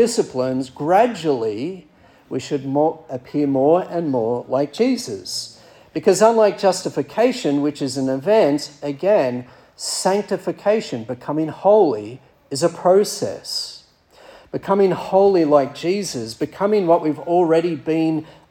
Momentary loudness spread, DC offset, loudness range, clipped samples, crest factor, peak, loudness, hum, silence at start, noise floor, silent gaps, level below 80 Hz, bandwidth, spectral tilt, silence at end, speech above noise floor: 13 LU; under 0.1%; 3 LU; under 0.1%; 18 dB; -2 dBFS; -19 LUFS; none; 0 s; -49 dBFS; none; -64 dBFS; 17 kHz; -5 dB/octave; 0.2 s; 31 dB